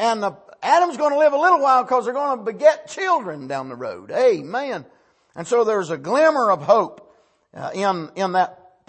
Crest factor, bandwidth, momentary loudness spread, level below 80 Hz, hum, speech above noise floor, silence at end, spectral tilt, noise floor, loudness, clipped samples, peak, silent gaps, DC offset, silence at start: 16 dB; 8.8 kHz; 13 LU; -72 dBFS; none; 36 dB; 0.35 s; -4.5 dB/octave; -55 dBFS; -20 LUFS; under 0.1%; -4 dBFS; none; under 0.1%; 0 s